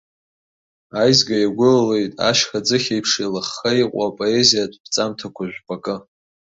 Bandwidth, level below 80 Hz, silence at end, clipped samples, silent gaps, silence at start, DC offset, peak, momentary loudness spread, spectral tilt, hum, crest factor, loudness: 8 kHz; -58 dBFS; 0.5 s; under 0.1%; 4.80-4.84 s; 0.95 s; under 0.1%; 0 dBFS; 14 LU; -3.5 dB/octave; none; 20 dB; -18 LUFS